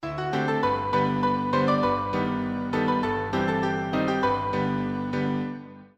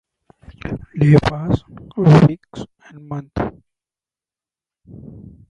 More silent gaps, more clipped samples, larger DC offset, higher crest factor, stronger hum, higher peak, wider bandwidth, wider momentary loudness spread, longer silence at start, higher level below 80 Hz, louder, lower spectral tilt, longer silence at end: neither; neither; neither; about the same, 14 dB vs 18 dB; first, 50 Hz at -50 dBFS vs none; second, -10 dBFS vs 0 dBFS; first, 8.8 kHz vs 7.6 kHz; second, 5 LU vs 23 LU; second, 0 s vs 0.65 s; second, -52 dBFS vs -40 dBFS; second, -26 LUFS vs -16 LUFS; about the same, -7.5 dB/octave vs -8.5 dB/octave; second, 0.1 s vs 0.3 s